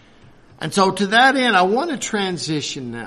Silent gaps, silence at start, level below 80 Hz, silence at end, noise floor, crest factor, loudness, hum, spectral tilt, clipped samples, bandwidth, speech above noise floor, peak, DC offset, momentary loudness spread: none; 0.6 s; -58 dBFS; 0 s; -47 dBFS; 18 dB; -18 LUFS; none; -3.5 dB/octave; under 0.1%; 13 kHz; 29 dB; -2 dBFS; under 0.1%; 10 LU